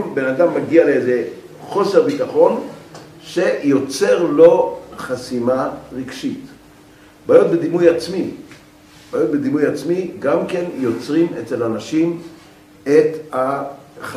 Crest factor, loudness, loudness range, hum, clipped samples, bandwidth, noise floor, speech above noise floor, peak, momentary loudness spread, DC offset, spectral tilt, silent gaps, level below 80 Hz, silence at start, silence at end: 18 dB; -17 LUFS; 4 LU; none; under 0.1%; 14.5 kHz; -45 dBFS; 29 dB; 0 dBFS; 16 LU; under 0.1%; -6 dB/octave; none; -58 dBFS; 0 s; 0 s